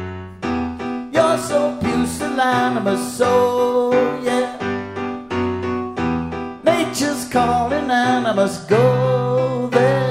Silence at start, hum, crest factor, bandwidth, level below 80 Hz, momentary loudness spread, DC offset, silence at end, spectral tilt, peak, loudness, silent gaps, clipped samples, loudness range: 0 s; none; 16 dB; 16 kHz; -46 dBFS; 9 LU; under 0.1%; 0 s; -5.5 dB/octave; -2 dBFS; -19 LUFS; none; under 0.1%; 3 LU